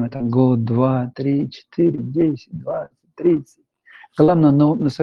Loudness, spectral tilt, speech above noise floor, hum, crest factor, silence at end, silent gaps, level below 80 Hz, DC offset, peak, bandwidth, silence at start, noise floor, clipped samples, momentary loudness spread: -18 LUFS; -10 dB/octave; 30 dB; none; 16 dB; 0 s; none; -54 dBFS; under 0.1%; -2 dBFS; 6.8 kHz; 0 s; -48 dBFS; under 0.1%; 13 LU